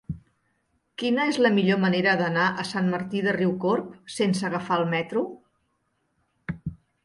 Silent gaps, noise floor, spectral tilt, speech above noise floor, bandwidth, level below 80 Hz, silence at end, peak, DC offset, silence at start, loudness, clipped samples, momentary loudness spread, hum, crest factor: none; -73 dBFS; -6 dB/octave; 49 dB; 11.5 kHz; -58 dBFS; 0.3 s; -8 dBFS; under 0.1%; 0.1 s; -24 LUFS; under 0.1%; 16 LU; none; 18 dB